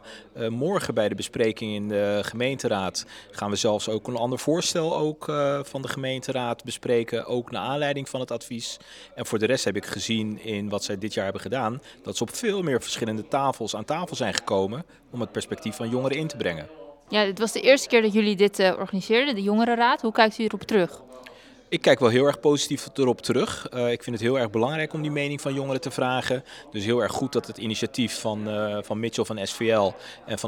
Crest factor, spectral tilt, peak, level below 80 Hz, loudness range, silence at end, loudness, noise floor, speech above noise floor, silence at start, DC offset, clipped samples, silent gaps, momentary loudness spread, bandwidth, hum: 26 dB; -4.5 dB/octave; 0 dBFS; -64 dBFS; 6 LU; 0 s; -25 LUFS; -48 dBFS; 23 dB; 0.05 s; under 0.1%; under 0.1%; none; 11 LU; 18 kHz; none